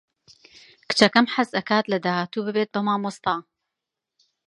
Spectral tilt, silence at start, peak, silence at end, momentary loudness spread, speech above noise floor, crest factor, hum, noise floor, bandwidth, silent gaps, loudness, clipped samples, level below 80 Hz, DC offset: -4.5 dB/octave; 0.9 s; 0 dBFS; 1.05 s; 9 LU; 63 dB; 24 dB; none; -85 dBFS; 11.5 kHz; none; -22 LUFS; under 0.1%; -68 dBFS; under 0.1%